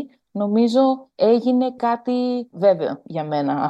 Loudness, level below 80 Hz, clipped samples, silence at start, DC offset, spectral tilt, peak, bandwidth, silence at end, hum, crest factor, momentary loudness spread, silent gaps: -20 LUFS; -72 dBFS; under 0.1%; 0 s; under 0.1%; -7.5 dB/octave; -4 dBFS; 8.2 kHz; 0 s; none; 16 dB; 9 LU; none